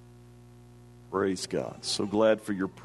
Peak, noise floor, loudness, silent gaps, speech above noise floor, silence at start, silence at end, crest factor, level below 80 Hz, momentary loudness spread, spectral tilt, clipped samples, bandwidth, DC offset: -10 dBFS; -52 dBFS; -29 LUFS; none; 23 dB; 0 s; 0 s; 20 dB; -64 dBFS; 8 LU; -4.5 dB/octave; under 0.1%; 12.5 kHz; under 0.1%